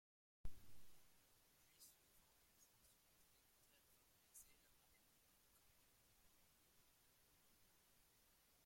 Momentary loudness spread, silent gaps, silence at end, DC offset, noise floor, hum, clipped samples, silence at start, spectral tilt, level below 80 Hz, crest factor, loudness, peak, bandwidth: 3 LU; none; 1.85 s; under 0.1%; -77 dBFS; none; under 0.1%; 0.45 s; -2.5 dB/octave; -74 dBFS; 24 dB; -67 LUFS; -38 dBFS; 16.5 kHz